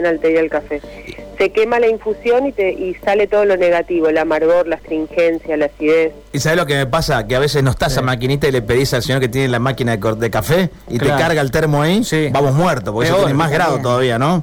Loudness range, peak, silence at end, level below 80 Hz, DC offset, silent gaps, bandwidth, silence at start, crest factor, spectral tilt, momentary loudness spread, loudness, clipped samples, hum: 1 LU; -6 dBFS; 0 s; -38 dBFS; under 0.1%; none; 19.5 kHz; 0 s; 8 dB; -5.5 dB/octave; 5 LU; -15 LUFS; under 0.1%; none